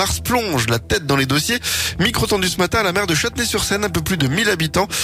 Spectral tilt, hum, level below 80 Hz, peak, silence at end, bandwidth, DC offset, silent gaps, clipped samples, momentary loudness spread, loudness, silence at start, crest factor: -3.5 dB/octave; none; -36 dBFS; -6 dBFS; 0 s; 16 kHz; under 0.1%; none; under 0.1%; 2 LU; -18 LUFS; 0 s; 14 dB